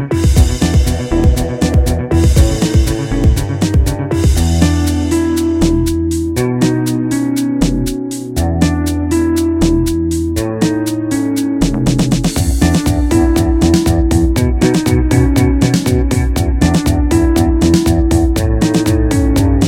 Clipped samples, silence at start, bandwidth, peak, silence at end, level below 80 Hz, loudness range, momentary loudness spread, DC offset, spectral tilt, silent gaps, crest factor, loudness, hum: under 0.1%; 0 s; 17 kHz; 0 dBFS; 0 s; -18 dBFS; 3 LU; 4 LU; 0.1%; -6.5 dB/octave; none; 12 dB; -13 LUFS; none